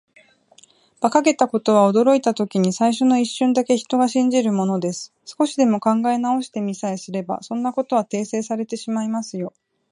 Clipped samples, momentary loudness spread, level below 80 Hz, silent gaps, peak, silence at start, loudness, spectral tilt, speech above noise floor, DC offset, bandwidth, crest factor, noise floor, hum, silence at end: under 0.1%; 10 LU; -72 dBFS; none; 0 dBFS; 1 s; -20 LUFS; -5.5 dB/octave; 34 dB; under 0.1%; 11 kHz; 18 dB; -54 dBFS; none; 0.45 s